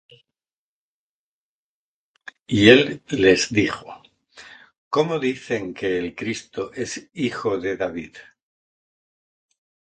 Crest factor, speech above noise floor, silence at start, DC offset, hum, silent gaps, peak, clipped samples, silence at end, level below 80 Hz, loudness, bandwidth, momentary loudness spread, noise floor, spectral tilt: 24 dB; over 69 dB; 2.5 s; under 0.1%; none; 4.78-4.91 s; 0 dBFS; under 0.1%; 1.6 s; -54 dBFS; -21 LUFS; 9.2 kHz; 17 LU; under -90 dBFS; -4.5 dB/octave